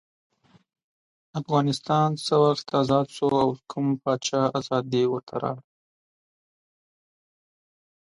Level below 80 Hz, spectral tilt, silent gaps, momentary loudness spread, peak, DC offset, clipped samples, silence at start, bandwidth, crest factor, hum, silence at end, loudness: -64 dBFS; -6 dB/octave; 5.23-5.27 s; 9 LU; -8 dBFS; under 0.1%; under 0.1%; 1.35 s; 11.5 kHz; 20 dB; none; 2.5 s; -24 LUFS